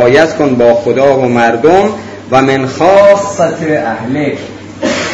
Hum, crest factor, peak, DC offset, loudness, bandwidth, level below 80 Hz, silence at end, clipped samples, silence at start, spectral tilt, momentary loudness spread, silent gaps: none; 10 dB; 0 dBFS; under 0.1%; -9 LUFS; 8 kHz; -44 dBFS; 0 s; 2%; 0 s; -5.5 dB/octave; 9 LU; none